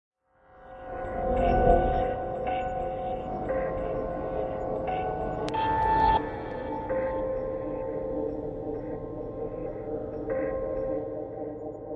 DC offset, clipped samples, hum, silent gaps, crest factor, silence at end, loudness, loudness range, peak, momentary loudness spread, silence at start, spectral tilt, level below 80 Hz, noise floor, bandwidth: under 0.1%; under 0.1%; none; none; 20 dB; 0 s; -30 LUFS; 6 LU; -8 dBFS; 12 LU; 0.5 s; -8 dB/octave; -40 dBFS; -57 dBFS; 7.8 kHz